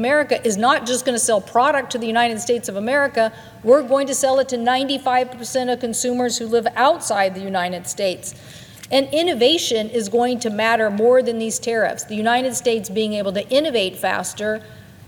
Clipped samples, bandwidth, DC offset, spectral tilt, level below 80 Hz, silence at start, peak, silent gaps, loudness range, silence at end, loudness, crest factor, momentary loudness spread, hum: under 0.1%; 19 kHz; under 0.1%; -3 dB/octave; -60 dBFS; 0 s; -2 dBFS; none; 2 LU; 0.25 s; -19 LUFS; 18 dB; 7 LU; none